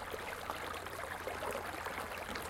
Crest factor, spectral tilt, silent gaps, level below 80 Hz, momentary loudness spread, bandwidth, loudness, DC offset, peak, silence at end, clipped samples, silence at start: 20 dB; -3 dB/octave; none; -60 dBFS; 2 LU; 17 kHz; -42 LUFS; under 0.1%; -22 dBFS; 0 s; under 0.1%; 0 s